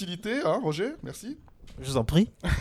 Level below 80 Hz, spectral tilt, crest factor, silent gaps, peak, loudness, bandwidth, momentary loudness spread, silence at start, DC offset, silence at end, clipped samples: -40 dBFS; -6 dB/octave; 20 dB; none; -8 dBFS; -28 LUFS; 15 kHz; 15 LU; 0 s; under 0.1%; 0 s; under 0.1%